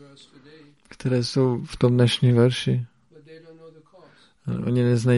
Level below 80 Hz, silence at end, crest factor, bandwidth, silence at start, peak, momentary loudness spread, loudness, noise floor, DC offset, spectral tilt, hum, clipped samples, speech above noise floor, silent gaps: -54 dBFS; 0 s; 16 dB; 11.5 kHz; 1 s; -8 dBFS; 13 LU; -22 LUFS; -53 dBFS; under 0.1%; -7 dB/octave; none; under 0.1%; 32 dB; none